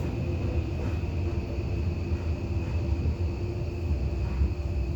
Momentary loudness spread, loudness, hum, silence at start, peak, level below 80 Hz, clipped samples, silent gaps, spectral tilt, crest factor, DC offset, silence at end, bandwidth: 2 LU; -30 LUFS; none; 0 s; -14 dBFS; -34 dBFS; under 0.1%; none; -8.5 dB/octave; 14 dB; under 0.1%; 0 s; 7.6 kHz